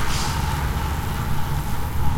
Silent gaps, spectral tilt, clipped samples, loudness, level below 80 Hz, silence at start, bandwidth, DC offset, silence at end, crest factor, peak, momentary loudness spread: none; -4.5 dB/octave; under 0.1%; -25 LUFS; -28 dBFS; 0 s; 17 kHz; under 0.1%; 0 s; 14 dB; -6 dBFS; 3 LU